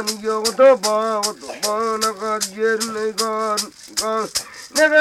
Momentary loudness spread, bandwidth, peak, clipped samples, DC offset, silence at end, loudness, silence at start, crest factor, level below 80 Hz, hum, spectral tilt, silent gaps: 11 LU; 16.5 kHz; -4 dBFS; under 0.1%; under 0.1%; 0 s; -19 LUFS; 0 s; 16 dB; -60 dBFS; none; -1.5 dB/octave; none